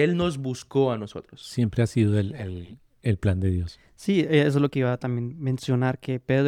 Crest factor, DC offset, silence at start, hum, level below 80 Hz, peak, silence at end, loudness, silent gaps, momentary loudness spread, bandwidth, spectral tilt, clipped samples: 18 dB; under 0.1%; 0 s; none; -50 dBFS; -8 dBFS; 0 s; -25 LUFS; none; 13 LU; 12.5 kHz; -7.5 dB/octave; under 0.1%